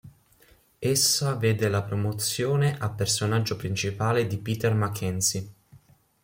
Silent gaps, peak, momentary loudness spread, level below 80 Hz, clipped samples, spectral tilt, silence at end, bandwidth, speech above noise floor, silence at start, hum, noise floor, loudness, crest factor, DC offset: none; -10 dBFS; 7 LU; -60 dBFS; under 0.1%; -4 dB/octave; 0.45 s; 16.5 kHz; 34 dB; 0.05 s; none; -59 dBFS; -25 LUFS; 16 dB; under 0.1%